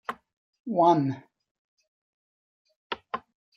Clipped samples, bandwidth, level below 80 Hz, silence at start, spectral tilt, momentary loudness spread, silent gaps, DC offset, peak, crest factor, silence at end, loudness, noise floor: under 0.1%; 6.8 kHz; -76 dBFS; 0.1 s; -7.5 dB/octave; 20 LU; 0.37-0.53 s, 0.60-0.64 s, 1.51-1.78 s, 1.88-2.65 s, 2.76-2.90 s; under 0.1%; -10 dBFS; 20 dB; 0.4 s; -25 LUFS; under -90 dBFS